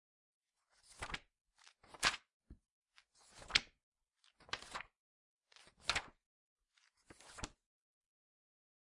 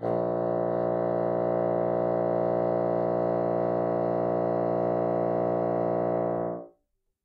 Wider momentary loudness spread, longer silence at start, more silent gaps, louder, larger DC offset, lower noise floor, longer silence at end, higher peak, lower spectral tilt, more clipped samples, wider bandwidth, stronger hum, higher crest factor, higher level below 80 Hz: first, 25 LU vs 1 LU; first, 0.9 s vs 0 s; first, 2.33-2.40 s, 2.72-2.82 s, 3.83-3.92 s, 4.99-5.41 s, 6.26-6.56 s vs none; second, -41 LUFS vs -27 LUFS; neither; about the same, -77 dBFS vs -75 dBFS; first, 1.45 s vs 0.55 s; first, -12 dBFS vs -16 dBFS; second, -0.5 dB/octave vs -11.5 dB/octave; neither; first, 11.5 kHz vs 4.7 kHz; neither; first, 36 dB vs 12 dB; about the same, -66 dBFS vs -68 dBFS